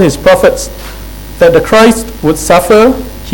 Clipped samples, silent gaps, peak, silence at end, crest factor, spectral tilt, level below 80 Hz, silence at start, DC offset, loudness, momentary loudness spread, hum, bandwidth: 3%; none; 0 dBFS; 0 s; 8 dB; -4.5 dB/octave; -26 dBFS; 0 s; 0.9%; -7 LUFS; 19 LU; none; 19.5 kHz